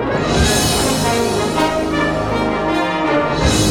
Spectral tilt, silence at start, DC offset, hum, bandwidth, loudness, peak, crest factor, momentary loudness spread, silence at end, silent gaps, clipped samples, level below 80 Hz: -4 dB/octave; 0 s; under 0.1%; none; 17 kHz; -16 LUFS; -2 dBFS; 14 dB; 4 LU; 0 s; none; under 0.1%; -28 dBFS